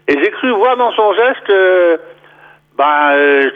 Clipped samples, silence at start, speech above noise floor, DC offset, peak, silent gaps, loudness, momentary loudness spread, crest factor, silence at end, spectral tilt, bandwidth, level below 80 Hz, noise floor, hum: under 0.1%; 0.1 s; 33 dB; under 0.1%; -2 dBFS; none; -11 LUFS; 5 LU; 10 dB; 0 s; -5 dB/octave; 5.2 kHz; -64 dBFS; -44 dBFS; none